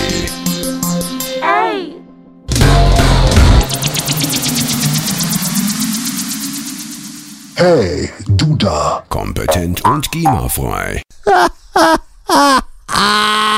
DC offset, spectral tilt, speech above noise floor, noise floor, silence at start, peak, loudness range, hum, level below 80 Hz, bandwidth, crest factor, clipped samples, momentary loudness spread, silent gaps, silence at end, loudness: under 0.1%; -4 dB/octave; 26 dB; -38 dBFS; 0 s; 0 dBFS; 3 LU; none; -22 dBFS; 16.5 kHz; 14 dB; under 0.1%; 10 LU; none; 0 s; -14 LUFS